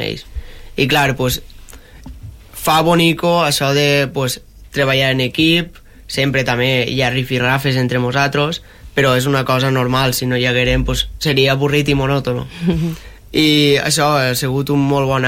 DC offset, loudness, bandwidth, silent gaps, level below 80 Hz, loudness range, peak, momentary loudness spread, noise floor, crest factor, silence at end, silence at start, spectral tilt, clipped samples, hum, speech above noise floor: under 0.1%; -15 LUFS; 16.5 kHz; none; -34 dBFS; 1 LU; -2 dBFS; 11 LU; -37 dBFS; 12 dB; 0 s; 0 s; -4.5 dB/octave; under 0.1%; none; 22 dB